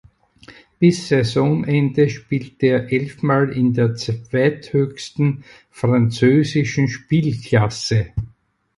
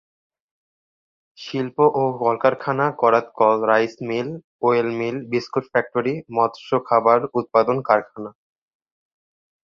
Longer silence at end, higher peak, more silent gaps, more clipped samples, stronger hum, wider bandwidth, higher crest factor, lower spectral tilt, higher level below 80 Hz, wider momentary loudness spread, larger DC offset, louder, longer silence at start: second, 0.5 s vs 1.35 s; about the same, -2 dBFS vs 0 dBFS; second, none vs 4.44-4.59 s; neither; neither; first, 11.5 kHz vs 7 kHz; about the same, 16 dB vs 20 dB; about the same, -7 dB/octave vs -7 dB/octave; first, -46 dBFS vs -66 dBFS; about the same, 8 LU vs 9 LU; neither; about the same, -19 LUFS vs -20 LUFS; second, 0.5 s vs 1.4 s